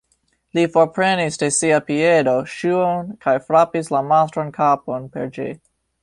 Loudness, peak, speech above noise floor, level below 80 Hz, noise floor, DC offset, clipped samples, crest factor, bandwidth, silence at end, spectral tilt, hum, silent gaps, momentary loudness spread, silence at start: -18 LUFS; -2 dBFS; 48 dB; -58 dBFS; -66 dBFS; under 0.1%; under 0.1%; 16 dB; 11.5 kHz; 0.45 s; -4.5 dB/octave; none; none; 11 LU; 0.55 s